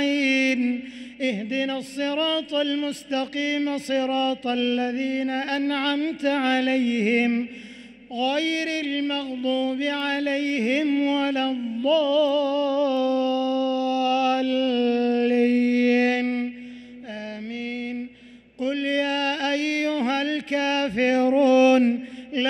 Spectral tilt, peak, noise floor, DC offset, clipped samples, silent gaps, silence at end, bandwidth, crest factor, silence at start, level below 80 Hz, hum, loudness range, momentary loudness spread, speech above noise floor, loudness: -4 dB/octave; -8 dBFS; -49 dBFS; under 0.1%; under 0.1%; none; 0 s; 11.5 kHz; 14 dB; 0 s; -68 dBFS; none; 4 LU; 11 LU; 26 dB; -23 LUFS